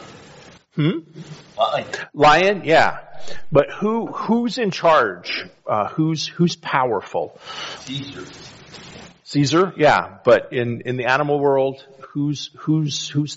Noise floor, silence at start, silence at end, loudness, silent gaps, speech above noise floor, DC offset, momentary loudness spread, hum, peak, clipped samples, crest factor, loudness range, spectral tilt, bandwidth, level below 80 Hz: -45 dBFS; 0 s; 0 s; -19 LUFS; none; 26 dB; under 0.1%; 21 LU; none; 0 dBFS; under 0.1%; 20 dB; 5 LU; -4 dB/octave; 8 kHz; -54 dBFS